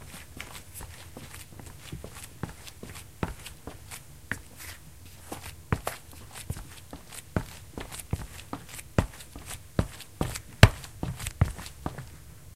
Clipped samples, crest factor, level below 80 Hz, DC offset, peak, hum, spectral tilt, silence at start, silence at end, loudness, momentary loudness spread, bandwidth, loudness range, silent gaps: under 0.1%; 32 dB; -40 dBFS; 0.2%; 0 dBFS; none; -5 dB/octave; 0 s; 0 s; -33 LUFS; 14 LU; 16 kHz; 13 LU; none